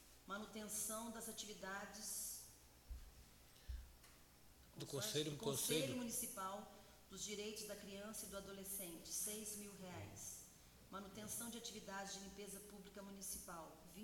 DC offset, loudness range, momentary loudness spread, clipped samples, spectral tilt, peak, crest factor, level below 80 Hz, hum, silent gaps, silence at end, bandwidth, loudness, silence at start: under 0.1%; 7 LU; 19 LU; under 0.1%; -2.5 dB/octave; -30 dBFS; 22 dB; -66 dBFS; none; none; 0 s; 17 kHz; -48 LUFS; 0 s